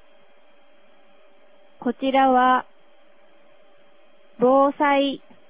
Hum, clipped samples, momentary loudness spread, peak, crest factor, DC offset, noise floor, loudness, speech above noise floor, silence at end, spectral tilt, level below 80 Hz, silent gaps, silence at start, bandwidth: none; under 0.1%; 9 LU; -6 dBFS; 18 dB; 0.4%; -57 dBFS; -20 LUFS; 39 dB; 0.35 s; -8 dB/octave; -64 dBFS; none; 1.8 s; 4 kHz